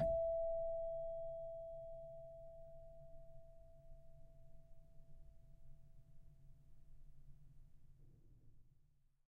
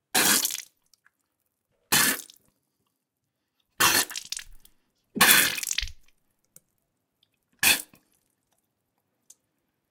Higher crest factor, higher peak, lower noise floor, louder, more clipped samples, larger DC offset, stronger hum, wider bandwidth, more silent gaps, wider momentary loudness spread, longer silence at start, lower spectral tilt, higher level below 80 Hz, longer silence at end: second, 20 dB vs 28 dB; second, -28 dBFS vs 0 dBFS; second, -72 dBFS vs -81 dBFS; second, -46 LUFS vs -22 LUFS; neither; neither; neither; second, 3.5 kHz vs 19 kHz; neither; first, 27 LU vs 19 LU; second, 0 s vs 0.15 s; first, -6.5 dB/octave vs 0 dB/octave; second, -60 dBFS vs -54 dBFS; second, 0.45 s vs 2.05 s